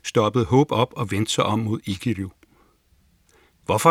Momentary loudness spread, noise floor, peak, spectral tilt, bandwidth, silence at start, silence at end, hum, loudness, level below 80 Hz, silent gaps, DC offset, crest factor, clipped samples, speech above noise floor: 10 LU; -61 dBFS; -2 dBFS; -5.5 dB/octave; 16.5 kHz; 0.05 s; 0 s; none; -22 LUFS; -56 dBFS; none; under 0.1%; 20 dB; under 0.1%; 39 dB